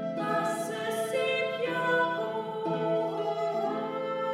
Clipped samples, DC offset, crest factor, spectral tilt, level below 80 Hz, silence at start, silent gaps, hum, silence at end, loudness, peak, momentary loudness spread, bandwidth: under 0.1%; under 0.1%; 16 dB; -4.5 dB/octave; -78 dBFS; 0 s; none; none; 0 s; -30 LUFS; -14 dBFS; 5 LU; 16 kHz